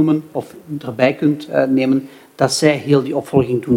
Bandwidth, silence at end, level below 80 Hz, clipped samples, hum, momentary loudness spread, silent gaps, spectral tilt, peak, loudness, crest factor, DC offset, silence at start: 16 kHz; 0 s; -54 dBFS; under 0.1%; none; 13 LU; none; -6 dB/octave; 0 dBFS; -17 LUFS; 16 dB; under 0.1%; 0 s